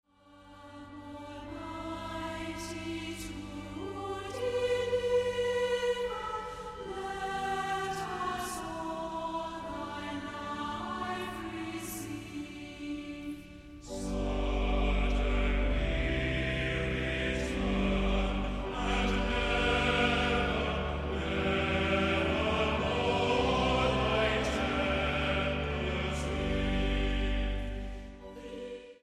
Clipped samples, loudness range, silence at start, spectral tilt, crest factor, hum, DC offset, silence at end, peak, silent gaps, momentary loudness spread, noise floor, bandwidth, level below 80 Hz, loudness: under 0.1%; 9 LU; 0.3 s; -5.5 dB/octave; 20 dB; none; under 0.1%; 0.1 s; -12 dBFS; none; 14 LU; -57 dBFS; 14 kHz; -38 dBFS; -32 LUFS